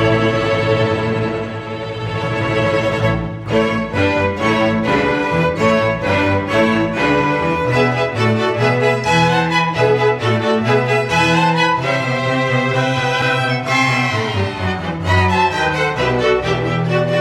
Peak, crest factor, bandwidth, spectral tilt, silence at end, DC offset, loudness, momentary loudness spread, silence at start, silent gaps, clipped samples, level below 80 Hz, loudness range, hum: -2 dBFS; 14 dB; 13 kHz; -6 dB/octave; 0 s; under 0.1%; -16 LUFS; 5 LU; 0 s; none; under 0.1%; -40 dBFS; 3 LU; none